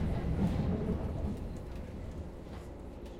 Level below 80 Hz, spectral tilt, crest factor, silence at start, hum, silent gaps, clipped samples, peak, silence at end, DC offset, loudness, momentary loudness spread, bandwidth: -42 dBFS; -8.5 dB/octave; 16 dB; 0 s; none; none; under 0.1%; -20 dBFS; 0 s; under 0.1%; -38 LUFS; 14 LU; 13 kHz